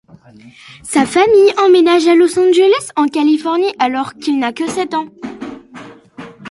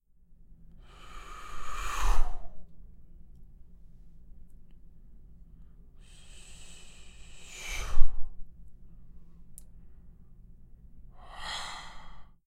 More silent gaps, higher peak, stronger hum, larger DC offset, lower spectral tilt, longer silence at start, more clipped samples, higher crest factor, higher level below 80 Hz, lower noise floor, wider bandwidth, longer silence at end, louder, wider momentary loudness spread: neither; about the same, 0 dBFS vs -2 dBFS; neither; neither; about the same, -4 dB/octave vs -3 dB/octave; second, 0.7 s vs 1.15 s; neither; second, 14 dB vs 24 dB; second, -56 dBFS vs -34 dBFS; second, -36 dBFS vs -55 dBFS; first, 11.5 kHz vs 8.8 kHz; second, 0 s vs 0.25 s; first, -12 LUFS vs -40 LUFS; second, 19 LU vs 23 LU